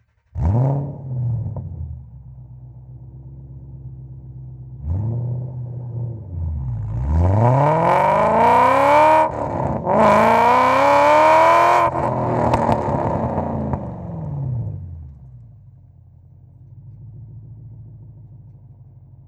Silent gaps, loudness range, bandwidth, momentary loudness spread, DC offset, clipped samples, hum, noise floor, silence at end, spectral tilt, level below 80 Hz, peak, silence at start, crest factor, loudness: none; 18 LU; 13.5 kHz; 24 LU; under 0.1%; under 0.1%; none; -46 dBFS; 0.45 s; -7.5 dB/octave; -38 dBFS; -2 dBFS; 0.35 s; 18 dB; -17 LUFS